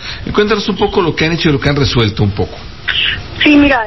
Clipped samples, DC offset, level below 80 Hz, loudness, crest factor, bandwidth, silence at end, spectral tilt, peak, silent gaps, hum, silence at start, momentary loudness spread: under 0.1%; 2%; -28 dBFS; -13 LUFS; 12 dB; 6 kHz; 0 s; -6 dB/octave; 0 dBFS; none; none; 0 s; 8 LU